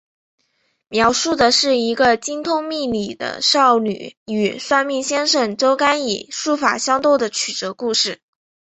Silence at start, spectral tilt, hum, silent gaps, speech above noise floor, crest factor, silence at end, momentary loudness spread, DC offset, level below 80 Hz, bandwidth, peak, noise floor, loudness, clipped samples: 0.9 s; -2 dB/octave; none; 4.17-4.26 s; 49 dB; 18 dB; 0.45 s; 9 LU; under 0.1%; -56 dBFS; 8.4 kHz; -2 dBFS; -67 dBFS; -17 LUFS; under 0.1%